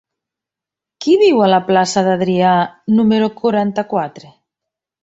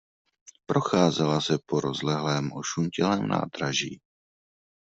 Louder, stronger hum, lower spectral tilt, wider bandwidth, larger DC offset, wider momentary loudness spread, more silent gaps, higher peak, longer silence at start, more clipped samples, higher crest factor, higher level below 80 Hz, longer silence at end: first, -14 LUFS vs -26 LUFS; neither; about the same, -5.5 dB/octave vs -5 dB/octave; about the same, 8 kHz vs 8 kHz; neither; first, 9 LU vs 6 LU; neither; first, -2 dBFS vs -6 dBFS; first, 1 s vs 0.7 s; neither; second, 14 dB vs 22 dB; first, -58 dBFS vs -64 dBFS; about the same, 0.85 s vs 0.85 s